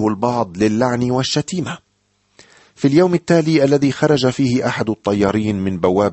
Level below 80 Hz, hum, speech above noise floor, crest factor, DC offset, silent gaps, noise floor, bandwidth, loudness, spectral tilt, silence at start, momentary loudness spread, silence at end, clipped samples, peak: -50 dBFS; none; 48 dB; 14 dB; under 0.1%; none; -64 dBFS; 8.4 kHz; -17 LUFS; -6 dB/octave; 0 s; 6 LU; 0 s; under 0.1%; -2 dBFS